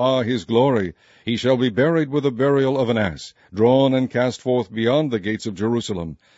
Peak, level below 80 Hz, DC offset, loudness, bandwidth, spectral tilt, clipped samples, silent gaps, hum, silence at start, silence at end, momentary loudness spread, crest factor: -4 dBFS; -54 dBFS; under 0.1%; -20 LUFS; 8 kHz; -6.5 dB/octave; under 0.1%; none; none; 0 s; 0.25 s; 9 LU; 16 dB